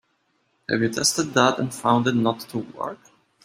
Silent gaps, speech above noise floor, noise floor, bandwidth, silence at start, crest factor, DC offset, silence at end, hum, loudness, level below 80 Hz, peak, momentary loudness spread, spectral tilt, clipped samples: none; 47 dB; -69 dBFS; 16 kHz; 0.7 s; 22 dB; under 0.1%; 0.5 s; none; -22 LUFS; -64 dBFS; -2 dBFS; 13 LU; -4 dB/octave; under 0.1%